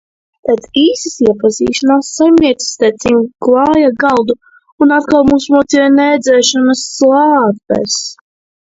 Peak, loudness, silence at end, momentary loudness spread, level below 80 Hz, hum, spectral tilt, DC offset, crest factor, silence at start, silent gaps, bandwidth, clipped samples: 0 dBFS; -11 LUFS; 0.55 s; 7 LU; -44 dBFS; none; -3.5 dB/octave; under 0.1%; 10 dB; 0.45 s; 4.72-4.78 s; 8 kHz; under 0.1%